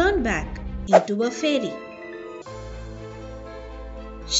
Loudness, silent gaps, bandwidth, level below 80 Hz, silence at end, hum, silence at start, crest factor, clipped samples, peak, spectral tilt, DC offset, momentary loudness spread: -22 LUFS; none; 8 kHz; -38 dBFS; 0 s; none; 0 s; 24 dB; under 0.1%; 0 dBFS; -3 dB/octave; under 0.1%; 19 LU